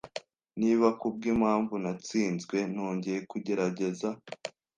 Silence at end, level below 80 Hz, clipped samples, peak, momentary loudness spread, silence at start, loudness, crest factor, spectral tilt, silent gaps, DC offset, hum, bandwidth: 0.3 s; -66 dBFS; under 0.1%; -10 dBFS; 15 LU; 0.05 s; -30 LUFS; 20 dB; -6 dB/octave; none; under 0.1%; none; 9.6 kHz